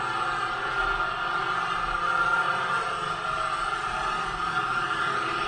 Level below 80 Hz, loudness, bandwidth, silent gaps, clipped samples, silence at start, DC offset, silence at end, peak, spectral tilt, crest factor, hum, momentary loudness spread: -48 dBFS; -26 LUFS; 10.5 kHz; none; under 0.1%; 0 s; under 0.1%; 0 s; -14 dBFS; -3 dB/octave; 14 dB; none; 4 LU